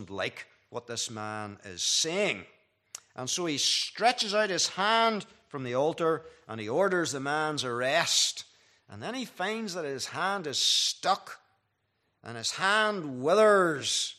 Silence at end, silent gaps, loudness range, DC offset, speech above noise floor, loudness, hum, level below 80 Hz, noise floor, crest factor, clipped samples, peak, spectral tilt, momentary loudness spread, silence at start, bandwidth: 0.05 s; none; 3 LU; under 0.1%; 48 dB; -28 LUFS; none; -78 dBFS; -76 dBFS; 20 dB; under 0.1%; -10 dBFS; -2 dB/octave; 16 LU; 0 s; 14.5 kHz